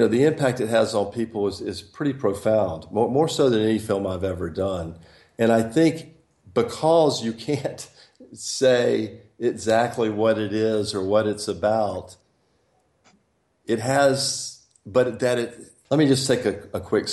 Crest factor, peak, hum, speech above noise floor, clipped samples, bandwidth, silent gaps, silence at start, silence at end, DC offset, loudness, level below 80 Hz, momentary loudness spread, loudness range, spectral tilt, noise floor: 16 dB; -8 dBFS; none; 45 dB; under 0.1%; 12.5 kHz; none; 0 s; 0 s; under 0.1%; -23 LUFS; -62 dBFS; 11 LU; 3 LU; -5 dB/octave; -67 dBFS